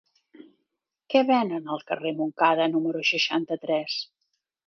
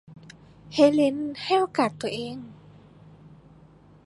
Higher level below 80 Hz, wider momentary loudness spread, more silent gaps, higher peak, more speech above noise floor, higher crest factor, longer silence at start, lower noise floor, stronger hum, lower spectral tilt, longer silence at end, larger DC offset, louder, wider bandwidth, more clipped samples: second, -80 dBFS vs -64 dBFS; second, 10 LU vs 17 LU; neither; about the same, -6 dBFS vs -6 dBFS; first, 56 dB vs 29 dB; about the same, 20 dB vs 20 dB; first, 0.4 s vs 0.1 s; first, -80 dBFS vs -53 dBFS; neither; about the same, -4.5 dB/octave vs -5.5 dB/octave; second, 0.65 s vs 1.5 s; neither; about the same, -25 LUFS vs -24 LUFS; second, 6.6 kHz vs 11.5 kHz; neither